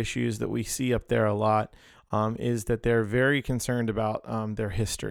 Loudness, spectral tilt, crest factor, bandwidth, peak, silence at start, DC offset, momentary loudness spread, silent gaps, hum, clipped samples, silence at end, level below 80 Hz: -27 LUFS; -5.5 dB/octave; 16 dB; 17.5 kHz; -12 dBFS; 0 s; under 0.1%; 7 LU; none; none; under 0.1%; 0 s; -46 dBFS